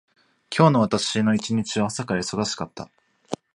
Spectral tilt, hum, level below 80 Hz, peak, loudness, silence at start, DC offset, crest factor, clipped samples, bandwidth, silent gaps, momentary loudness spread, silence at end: -5 dB/octave; none; -58 dBFS; -2 dBFS; -22 LUFS; 0.5 s; under 0.1%; 22 dB; under 0.1%; 11 kHz; none; 18 LU; 0.2 s